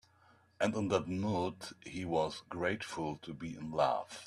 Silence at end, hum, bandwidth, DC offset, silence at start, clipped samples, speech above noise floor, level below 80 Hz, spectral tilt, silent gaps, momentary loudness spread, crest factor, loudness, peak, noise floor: 0 s; none; 13 kHz; under 0.1%; 0.6 s; under 0.1%; 30 dB; -68 dBFS; -5.5 dB/octave; none; 11 LU; 22 dB; -36 LUFS; -16 dBFS; -67 dBFS